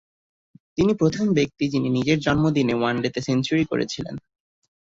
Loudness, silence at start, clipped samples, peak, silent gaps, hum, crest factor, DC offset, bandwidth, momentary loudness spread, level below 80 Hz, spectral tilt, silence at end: -22 LUFS; 0.75 s; under 0.1%; -6 dBFS; none; none; 16 dB; under 0.1%; 7.8 kHz; 9 LU; -52 dBFS; -6 dB/octave; 0.75 s